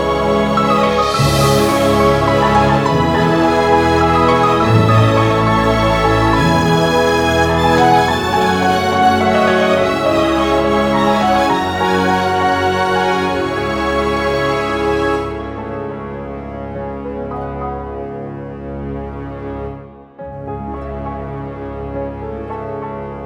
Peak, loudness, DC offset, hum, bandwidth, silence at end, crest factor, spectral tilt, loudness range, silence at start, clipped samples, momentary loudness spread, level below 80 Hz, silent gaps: 0 dBFS; -14 LUFS; under 0.1%; none; 18.5 kHz; 0 s; 14 dB; -5.5 dB/octave; 14 LU; 0 s; under 0.1%; 14 LU; -32 dBFS; none